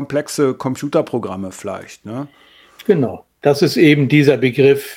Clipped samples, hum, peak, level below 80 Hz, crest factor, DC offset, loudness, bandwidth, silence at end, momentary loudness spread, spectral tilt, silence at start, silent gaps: under 0.1%; none; 0 dBFS; -60 dBFS; 16 dB; under 0.1%; -16 LUFS; 16.5 kHz; 0 s; 17 LU; -6 dB/octave; 0 s; none